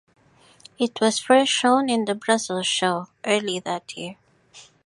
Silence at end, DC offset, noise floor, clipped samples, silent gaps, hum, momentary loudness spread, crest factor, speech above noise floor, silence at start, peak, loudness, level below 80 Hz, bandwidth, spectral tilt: 0.25 s; under 0.1%; -52 dBFS; under 0.1%; none; none; 12 LU; 20 dB; 30 dB; 0.8 s; -4 dBFS; -22 LUFS; -72 dBFS; 11.5 kHz; -3 dB/octave